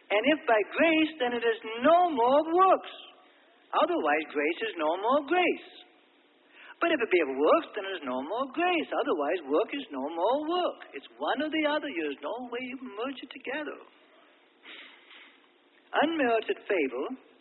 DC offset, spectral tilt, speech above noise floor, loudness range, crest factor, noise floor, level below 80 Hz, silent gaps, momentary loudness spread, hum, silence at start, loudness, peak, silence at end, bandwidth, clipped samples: under 0.1%; -7.5 dB/octave; 35 dB; 10 LU; 18 dB; -63 dBFS; -78 dBFS; none; 13 LU; none; 0.1 s; -28 LUFS; -12 dBFS; 0.25 s; 4.3 kHz; under 0.1%